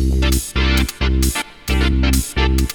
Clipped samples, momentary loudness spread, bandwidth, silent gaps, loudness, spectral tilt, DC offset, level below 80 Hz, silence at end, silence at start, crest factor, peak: under 0.1%; 3 LU; 19 kHz; none; -18 LUFS; -4.5 dB/octave; under 0.1%; -18 dBFS; 0 s; 0 s; 14 dB; -2 dBFS